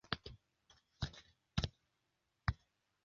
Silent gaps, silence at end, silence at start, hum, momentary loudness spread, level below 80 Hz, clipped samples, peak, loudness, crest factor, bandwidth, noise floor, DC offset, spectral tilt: none; 0.5 s; 0.1 s; none; 16 LU; -52 dBFS; under 0.1%; -16 dBFS; -45 LUFS; 32 dB; 7.4 kHz; -85 dBFS; under 0.1%; -4 dB/octave